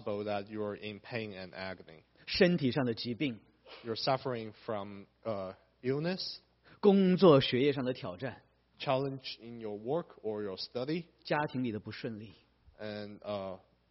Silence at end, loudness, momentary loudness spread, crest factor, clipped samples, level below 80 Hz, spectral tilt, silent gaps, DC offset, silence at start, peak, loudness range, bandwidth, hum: 0.35 s; -34 LUFS; 17 LU; 22 dB; under 0.1%; -68 dBFS; -5 dB/octave; none; under 0.1%; 0 s; -12 dBFS; 8 LU; 5.8 kHz; none